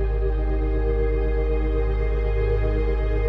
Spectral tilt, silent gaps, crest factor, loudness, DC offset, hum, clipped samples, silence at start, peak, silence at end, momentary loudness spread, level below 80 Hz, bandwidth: -10 dB/octave; none; 10 dB; -24 LUFS; under 0.1%; none; under 0.1%; 0 s; -12 dBFS; 0 s; 1 LU; -22 dBFS; 4.4 kHz